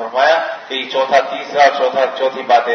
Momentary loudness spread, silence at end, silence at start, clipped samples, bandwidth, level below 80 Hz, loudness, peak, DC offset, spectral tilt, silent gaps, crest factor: 8 LU; 0 s; 0 s; under 0.1%; 6.6 kHz; -66 dBFS; -15 LUFS; 0 dBFS; under 0.1%; -2.5 dB/octave; none; 14 dB